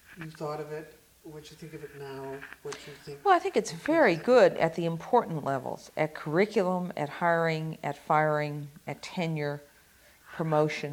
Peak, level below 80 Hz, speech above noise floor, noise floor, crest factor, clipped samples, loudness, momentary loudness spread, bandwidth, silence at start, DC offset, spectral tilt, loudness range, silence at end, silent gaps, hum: -8 dBFS; -68 dBFS; 30 dB; -59 dBFS; 20 dB; under 0.1%; -28 LUFS; 19 LU; 17 kHz; 0.1 s; under 0.1%; -6 dB/octave; 7 LU; 0 s; none; none